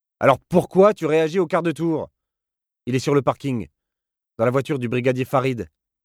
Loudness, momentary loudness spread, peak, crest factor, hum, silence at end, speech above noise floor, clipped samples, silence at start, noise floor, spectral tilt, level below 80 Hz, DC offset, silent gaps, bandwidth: -21 LUFS; 13 LU; -2 dBFS; 20 dB; none; 0.4 s; 67 dB; under 0.1%; 0.2 s; -87 dBFS; -7 dB/octave; -56 dBFS; under 0.1%; none; 15.5 kHz